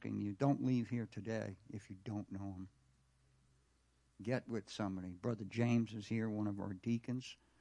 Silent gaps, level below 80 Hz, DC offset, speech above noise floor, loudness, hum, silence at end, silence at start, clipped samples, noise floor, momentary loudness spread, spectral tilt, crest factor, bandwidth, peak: none; -76 dBFS; under 0.1%; 35 dB; -41 LUFS; none; 0.25 s; 0 s; under 0.1%; -75 dBFS; 14 LU; -7.5 dB/octave; 20 dB; 10.5 kHz; -22 dBFS